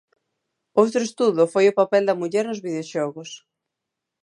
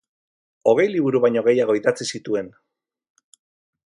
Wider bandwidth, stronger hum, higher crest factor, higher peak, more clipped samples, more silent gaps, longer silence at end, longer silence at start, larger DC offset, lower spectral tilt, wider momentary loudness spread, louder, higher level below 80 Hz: about the same, 11 kHz vs 11.5 kHz; neither; about the same, 20 dB vs 18 dB; about the same, -2 dBFS vs -4 dBFS; neither; neither; second, 0.85 s vs 1.4 s; about the same, 0.75 s vs 0.65 s; neither; about the same, -5 dB/octave vs -5 dB/octave; first, 12 LU vs 9 LU; about the same, -21 LUFS vs -20 LUFS; second, -78 dBFS vs -68 dBFS